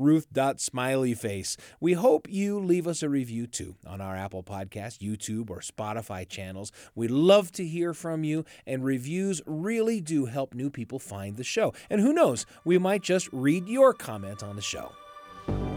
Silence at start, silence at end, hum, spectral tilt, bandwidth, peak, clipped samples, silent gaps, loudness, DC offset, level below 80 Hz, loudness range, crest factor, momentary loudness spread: 0 s; 0 s; none; -5.5 dB/octave; 19 kHz; -8 dBFS; under 0.1%; none; -28 LUFS; under 0.1%; -54 dBFS; 8 LU; 20 dB; 15 LU